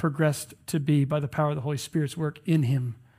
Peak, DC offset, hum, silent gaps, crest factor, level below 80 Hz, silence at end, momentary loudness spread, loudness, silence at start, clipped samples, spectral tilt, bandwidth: -10 dBFS; under 0.1%; none; none; 16 dB; -62 dBFS; 0.25 s; 6 LU; -27 LUFS; 0 s; under 0.1%; -6.5 dB/octave; 16 kHz